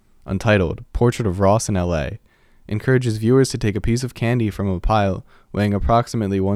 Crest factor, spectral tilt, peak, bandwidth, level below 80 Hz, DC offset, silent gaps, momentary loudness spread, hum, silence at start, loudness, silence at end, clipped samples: 16 dB; -6.5 dB/octave; -2 dBFS; 14 kHz; -32 dBFS; under 0.1%; none; 8 LU; none; 0.25 s; -20 LUFS; 0 s; under 0.1%